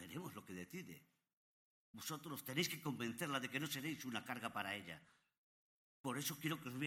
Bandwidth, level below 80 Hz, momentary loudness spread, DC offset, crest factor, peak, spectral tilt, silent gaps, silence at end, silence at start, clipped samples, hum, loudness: 18 kHz; -84 dBFS; 12 LU; under 0.1%; 22 dB; -26 dBFS; -3.5 dB/octave; 1.33-1.94 s, 5.38-6.04 s; 0 s; 0 s; under 0.1%; none; -45 LUFS